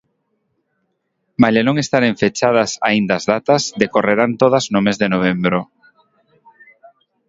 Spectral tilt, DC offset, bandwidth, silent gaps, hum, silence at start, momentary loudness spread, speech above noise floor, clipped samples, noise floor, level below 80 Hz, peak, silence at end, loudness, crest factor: -5 dB/octave; under 0.1%; 7.8 kHz; none; none; 1.4 s; 4 LU; 54 dB; under 0.1%; -70 dBFS; -54 dBFS; 0 dBFS; 1.65 s; -16 LUFS; 18 dB